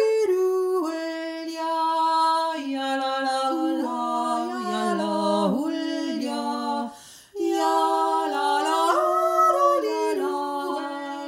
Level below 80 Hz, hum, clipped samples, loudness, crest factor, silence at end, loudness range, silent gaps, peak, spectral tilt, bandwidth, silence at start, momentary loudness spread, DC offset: -76 dBFS; none; under 0.1%; -24 LUFS; 16 dB; 0 s; 4 LU; none; -8 dBFS; -4.5 dB/octave; 16.5 kHz; 0 s; 9 LU; under 0.1%